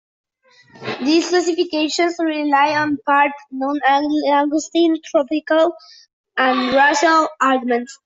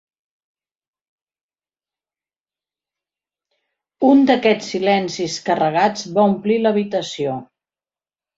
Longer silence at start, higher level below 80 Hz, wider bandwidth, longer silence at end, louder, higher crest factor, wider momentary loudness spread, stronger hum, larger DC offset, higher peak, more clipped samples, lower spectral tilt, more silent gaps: second, 0.8 s vs 4 s; about the same, -64 dBFS vs -64 dBFS; about the same, 8 kHz vs 7.8 kHz; second, 0.1 s vs 0.95 s; about the same, -17 LUFS vs -18 LUFS; second, 14 dB vs 20 dB; second, 7 LU vs 10 LU; neither; neither; about the same, -2 dBFS vs -2 dBFS; neither; second, -3 dB/octave vs -5 dB/octave; first, 6.13-6.24 s vs none